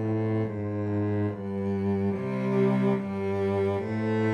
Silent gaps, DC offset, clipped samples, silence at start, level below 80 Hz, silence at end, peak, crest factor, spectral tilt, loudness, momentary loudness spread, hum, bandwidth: none; under 0.1%; under 0.1%; 0 s; -66 dBFS; 0 s; -14 dBFS; 14 dB; -9.5 dB/octave; -28 LUFS; 6 LU; none; 8.2 kHz